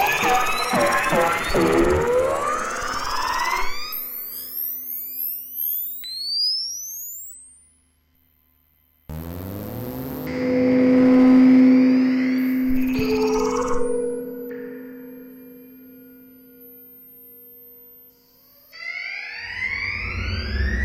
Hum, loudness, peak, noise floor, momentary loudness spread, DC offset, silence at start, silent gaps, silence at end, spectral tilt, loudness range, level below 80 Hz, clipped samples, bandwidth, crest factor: 50 Hz at -65 dBFS; -21 LUFS; -6 dBFS; -62 dBFS; 19 LU; under 0.1%; 0 s; none; 0 s; -4.5 dB/octave; 18 LU; -38 dBFS; under 0.1%; 16.5 kHz; 16 dB